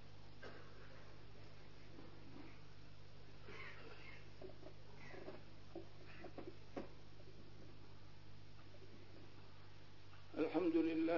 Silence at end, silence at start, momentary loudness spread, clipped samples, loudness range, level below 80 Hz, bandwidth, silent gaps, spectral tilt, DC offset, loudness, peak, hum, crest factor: 0 s; 0 s; 19 LU; under 0.1%; 11 LU; -68 dBFS; 6 kHz; none; -5.5 dB/octave; 0.3%; -49 LUFS; -26 dBFS; 50 Hz at -65 dBFS; 24 dB